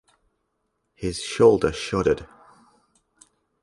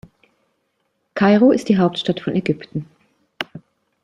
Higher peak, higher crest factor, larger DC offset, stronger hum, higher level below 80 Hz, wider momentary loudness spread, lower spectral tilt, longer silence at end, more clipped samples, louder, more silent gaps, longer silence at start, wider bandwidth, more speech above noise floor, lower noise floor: about the same, -4 dBFS vs -2 dBFS; about the same, 20 dB vs 18 dB; neither; neither; first, -48 dBFS vs -60 dBFS; second, 13 LU vs 17 LU; second, -5.5 dB/octave vs -7 dB/octave; first, 1.35 s vs 0.45 s; neither; second, -22 LUFS vs -18 LUFS; neither; second, 1 s vs 1.15 s; about the same, 11.5 kHz vs 10.5 kHz; about the same, 54 dB vs 53 dB; first, -75 dBFS vs -70 dBFS